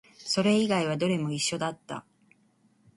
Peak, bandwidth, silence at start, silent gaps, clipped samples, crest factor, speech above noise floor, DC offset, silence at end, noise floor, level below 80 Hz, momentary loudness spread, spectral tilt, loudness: -12 dBFS; 11.5 kHz; 0.2 s; none; under 0.1%; 16 dB; 39 dB; under 0.1%; 0.95 s; -66 dBFS; -68 dBFS; 17 LU; -4.5 dB/octave; -27 LUFS